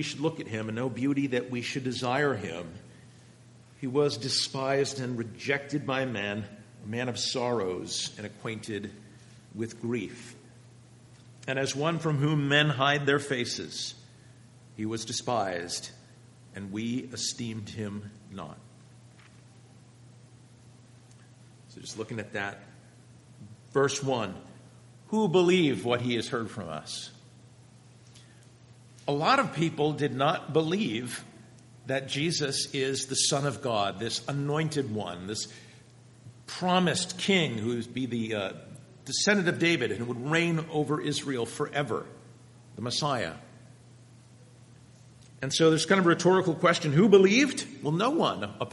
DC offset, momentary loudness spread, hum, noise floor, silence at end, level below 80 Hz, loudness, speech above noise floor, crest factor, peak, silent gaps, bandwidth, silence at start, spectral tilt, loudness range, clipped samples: under 0.1%; 17 LU; none; -54 dBFS; 0 s; -70 dBFS; -28 LUFS; 26 dB; 24 dB; -6 dBFS; none; 11.5 kHz; 0 s; -4.5 dB/octave; 10 LU; under 0.1%